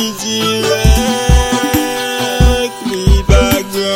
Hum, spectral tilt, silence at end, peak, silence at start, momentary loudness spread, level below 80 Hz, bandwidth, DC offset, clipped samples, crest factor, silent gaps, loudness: none; -4.5 dB/octave; 0 s; 0 dBFS; 0 s; 5 LU; -16 dBFS; 16.5 kHz; under 0.1%; under 0.1%; 12 dB; none; -13 LUFS